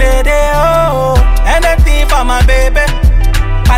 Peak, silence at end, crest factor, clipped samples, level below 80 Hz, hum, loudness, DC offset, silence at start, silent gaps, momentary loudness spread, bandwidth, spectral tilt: 0 dBFS; 0 s; 8 dB; under 0.1%; -10 dBFS; none; -11 LUFS; under 0.1%; 0 s; none; 2 LU; 15.5 kHz; -5 dB/octave